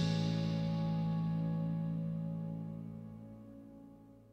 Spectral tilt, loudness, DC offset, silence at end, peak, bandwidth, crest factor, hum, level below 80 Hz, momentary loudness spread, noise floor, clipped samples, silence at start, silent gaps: -8 dB/octave; -37 LUFS; under 0.1%; 0.05 s; -22 dBFS; 7.8 kHz; 16 dB; none; -62 dBFS; 19 LU; -57 dBFS; under 0.1%; 0 s; none